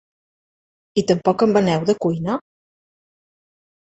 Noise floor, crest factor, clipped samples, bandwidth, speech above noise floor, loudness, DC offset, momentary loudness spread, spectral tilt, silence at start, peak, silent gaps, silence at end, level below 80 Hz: under -90 dBFS; 20 dB; under 0.1%; 8.2 kHz; over 72 dB; -19 LUFS; under 0.1%; 9 LU; -6.5 dB/octave; 0.95 s; -2 dBFS; none; 1.55 s; -58 dBFS